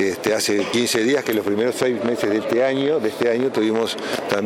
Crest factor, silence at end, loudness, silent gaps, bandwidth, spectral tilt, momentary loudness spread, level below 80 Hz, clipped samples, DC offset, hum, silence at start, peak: 20 dB; 0 s; -20 LUFS; none; 17 kHz; -4 dB/octave; 3 LU; -64 dBFS; under 0.1%; under 0.1%; none; 0 s; 0 dBFS